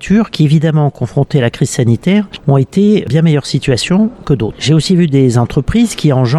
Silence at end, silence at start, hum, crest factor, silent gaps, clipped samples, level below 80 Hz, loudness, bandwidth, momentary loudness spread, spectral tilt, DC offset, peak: 0 s; 0 s; none; 10 dB; none; under 0.1%; -36 dBFS; -12 LUFS; 12.5 kHz; 4 LU; -6.5 dB/octave; under 0.1%; 0 dBFS